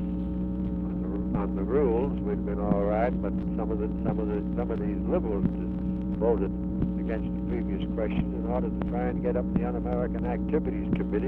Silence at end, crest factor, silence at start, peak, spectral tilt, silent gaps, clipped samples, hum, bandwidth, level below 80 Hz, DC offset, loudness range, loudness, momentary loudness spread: 0 s; 16 dB; 0 s; -12 dBFS; -11.5 dB/octave; none; under 0.1%; none; 3.8 kHz; -36 dBFS; under 0.1%; 1 LU; -29 LUFS; 5 LU